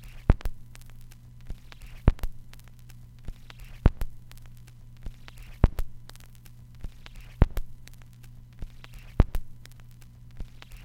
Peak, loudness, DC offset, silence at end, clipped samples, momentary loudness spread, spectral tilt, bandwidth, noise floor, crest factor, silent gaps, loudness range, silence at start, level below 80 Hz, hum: -2 dBFS; -30 LUFS; under 0.1%; 0 s; under 0.1%; 22 LU; -7.5 dB/octave; 16 kHz; -47 dBFS; 28 dB; none; 3 LU; 0 s; -32 dBFS; none